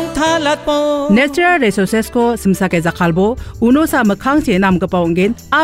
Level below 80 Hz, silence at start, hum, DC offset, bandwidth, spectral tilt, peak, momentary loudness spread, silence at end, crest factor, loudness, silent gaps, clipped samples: -36 dBFS; 0 s; none; under 0.1%; 16 kHz; -5.5 dB/octave; -2 dBFS; 4 LU; 0 s; 10 dB; -14 LUFS; none; under 0.1%